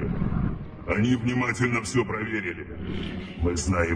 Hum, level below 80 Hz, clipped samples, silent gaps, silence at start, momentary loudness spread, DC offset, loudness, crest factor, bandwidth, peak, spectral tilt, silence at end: none; -38 dBFS; under 0.1%; none; 0 s; 10 LU; under 0.1%; -27 LUFS; 16 dB; 10.5 kHz; -10 dBFS; -5.5 dB/octave; 0 s